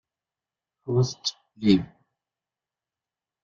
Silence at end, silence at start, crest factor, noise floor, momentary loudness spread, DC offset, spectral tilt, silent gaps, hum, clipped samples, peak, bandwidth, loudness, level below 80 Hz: 1.6 s; 0.85 s; 22 dB; under -90 dBFS; 17 LU; under 0.1%; -6 dB/octave; none; none; under 0.1%; -6 dBFS; 7.6 kHz; -25 LUFS; -60 dBFS